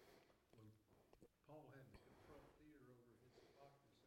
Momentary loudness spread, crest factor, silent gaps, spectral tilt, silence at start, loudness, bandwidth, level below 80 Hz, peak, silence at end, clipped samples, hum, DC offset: 5 LU; 18 dB; none; -6 dB/octave; 0 s; -67 LUFS; 16 kHz; -82 dBFS; -50 dBFS; 0 s; under 0.1%; none; under 0.1%